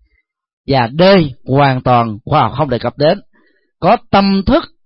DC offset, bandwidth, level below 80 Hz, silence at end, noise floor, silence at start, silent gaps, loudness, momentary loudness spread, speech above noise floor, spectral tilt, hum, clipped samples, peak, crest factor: under 0.1%; 5.8 kHz; -36 dBFS; 0.2 s; -61 dBFS; 0.7 s; none; -13 LUFS; 7 LU; 49 dB; -11 dB/octave; none; under 0.1%; 0 dBFS; 12 dB